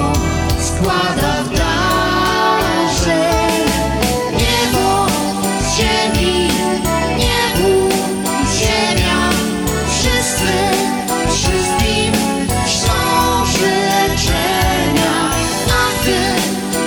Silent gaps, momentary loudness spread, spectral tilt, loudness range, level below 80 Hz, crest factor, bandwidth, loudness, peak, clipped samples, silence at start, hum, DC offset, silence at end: none; 3 LU; -3.5 dB/octave; 1 LU; -26 dBFS; 14 dB; 19.5 kHz; -14 LUFS; 0 dBFS; under 0.1%; 0 s; none; under 0.1%; 0 s